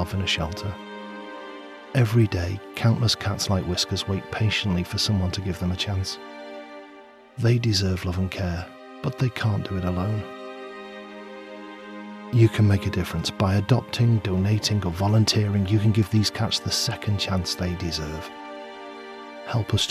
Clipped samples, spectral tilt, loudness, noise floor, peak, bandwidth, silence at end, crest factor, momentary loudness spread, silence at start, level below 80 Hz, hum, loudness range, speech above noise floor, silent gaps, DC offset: under 0.1%; -5.5 dB/octave; -24 LUFS; -47 dBFS; -6 dBFS; 14.5 kHz; 0 s; 18 dB; 18 LU; 0 s; -46 dBFS; none; 6 LU; 24 dB; none; under 0.1%